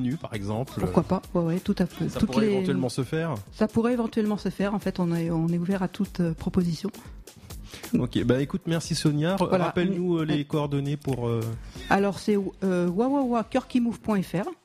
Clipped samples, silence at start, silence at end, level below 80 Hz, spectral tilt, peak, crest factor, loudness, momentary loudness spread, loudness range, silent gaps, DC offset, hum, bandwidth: under 0.1%; 0 s; 0.1 s; -48 dBFS; -7 dB/octave; -6 dBFS; 20 dB; -26 LUFS; 7 LU; 2 LU; none; under 0.1%; none; 15.5 kHz